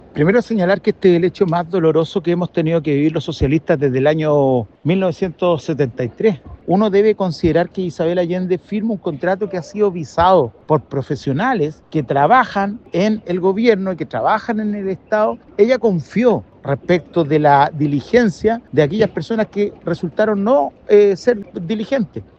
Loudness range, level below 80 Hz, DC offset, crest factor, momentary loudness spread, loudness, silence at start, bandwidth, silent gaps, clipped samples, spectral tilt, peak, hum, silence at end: 2 LU; -46 dBFS; under 0.1%; 16 dB; 8 LU; -17 LUFS; 0.15 s; 7.8 kHz; none; under 0.1%; -7.5 dB/octave; 0 dBFS; none; 0.15 s